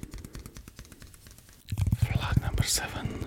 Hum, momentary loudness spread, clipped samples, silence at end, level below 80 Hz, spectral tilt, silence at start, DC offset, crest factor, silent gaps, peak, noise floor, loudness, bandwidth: none; 23 LU; under 0.1%; 0 s; -38 dBFS; -4 dB/octave; 0 s; under 0.1%; 20 dB; none; -10 dBFS; -52 dBFS; -29 LUFS; 17 kHz